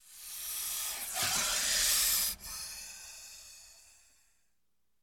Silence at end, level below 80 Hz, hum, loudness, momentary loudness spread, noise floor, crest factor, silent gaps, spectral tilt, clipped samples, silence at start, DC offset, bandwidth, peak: 1.2 s; -60 dBFS; none; -30 LUFS; 21 LU; -84 dBFS; 20 dB; none; 1.5 dB/octave; under 0.1%; 0.05 s; under 0.1%; 17 kHz; -16 dBFS